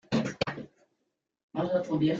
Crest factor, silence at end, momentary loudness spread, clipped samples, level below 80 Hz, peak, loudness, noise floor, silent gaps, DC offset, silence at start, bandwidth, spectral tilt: 18 dB; 0 s; 14 LU; under 0.1%; -62 dBFS; -14 dBFS; -31 LUFS; -81 dBFS; 1.43-1.49 s; under 0.1%; 0.1 s; 7.8 kHz; -6.5 dB/octave